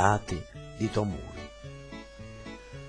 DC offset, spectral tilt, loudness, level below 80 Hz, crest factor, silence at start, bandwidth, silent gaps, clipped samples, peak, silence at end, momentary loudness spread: under 0.1%; -6 dB/octave; -34 LUFS; -48 dBFS; 24 dB; 0 s; 10.5 kHz; none; under 0.1%; -8 dBFS; 0 s; 15 LU